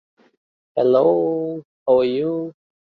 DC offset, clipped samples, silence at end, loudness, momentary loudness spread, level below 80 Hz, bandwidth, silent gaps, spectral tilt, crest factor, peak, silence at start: under 0.1%; under 0.1%; 0.4 s; -19 LUFS; 12 LU; -66 dBFS; 4.8 kHz; 1.65-1.86 s; -9.5 dB/octave; 16 dB; -4 dBFS; 0.75 s